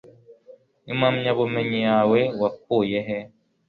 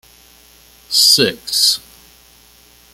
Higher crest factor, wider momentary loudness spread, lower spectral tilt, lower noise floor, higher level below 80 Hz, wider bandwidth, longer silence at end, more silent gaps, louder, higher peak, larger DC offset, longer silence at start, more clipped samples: about the same, 16 dB vs 18 dB; about the same, 10 LU vs 8 LU; first, -8.5 dB/octave vs -1 dB/octave; first, -51 dBFS vs -47 dBFS; second, -62 dBFS vs -56 dBFS; second, 5.2 kHz vs 17 kHz; second, 0.4 s vs 1.15 s; neither; second, -22 LUFS vs -12 LUFS; second, -8 dBFS vs 0 dBFS; neither; second, 0.3 s vs 0.9 s; neither